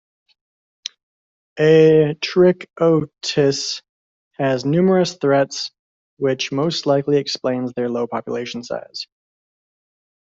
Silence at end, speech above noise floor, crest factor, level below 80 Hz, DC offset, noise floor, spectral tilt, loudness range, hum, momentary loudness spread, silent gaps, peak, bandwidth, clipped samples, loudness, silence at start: 1.15 s; over 72 dB; 16 dB; -60 dBFS; under 0.1%; under -90 dBFS; -5.5 dB/octave; 5 LU; none; 16 LU; 3.89-4.31 s, 5.79-6.17 s; -4 dBFS; 7.8 kHz; under 0.1%; -18 LUFS; 1.55 s